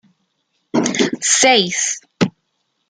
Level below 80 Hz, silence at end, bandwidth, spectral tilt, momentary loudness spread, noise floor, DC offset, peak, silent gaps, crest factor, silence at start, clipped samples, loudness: -62 dBFS; 0.6 s; 10.5 kHz; -2 dB/octave; 10 LU; -69 dBFS; under 0.1%; 0 dBFS; none; 18 dB; 0.75 s; under 0.1%; -16 LUFS